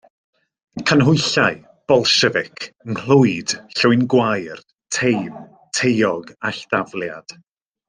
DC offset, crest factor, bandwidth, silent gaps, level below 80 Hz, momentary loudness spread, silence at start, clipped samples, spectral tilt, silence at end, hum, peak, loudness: under 0.1%; 18 dB; 10 kHz; 4.73-4.78 s; -58 dBFS; 17 LU; 0.75 s; under 0.1%; -4.5 dB/octave; 0.7 s; none; -2 dBFS; -18 LUFS